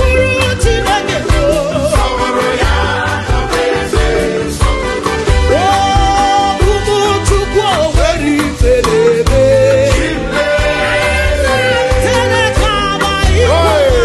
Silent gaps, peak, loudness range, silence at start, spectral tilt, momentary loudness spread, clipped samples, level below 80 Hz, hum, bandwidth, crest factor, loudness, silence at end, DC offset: none; 0 dBFS; 2 LU; 0 s; -4.5 dB/octave; 4 LU; under 0.1%; -18 dBFS; none; 12.5 kHz; 10 dB; -12 LUFS; 0 s; under 0.1%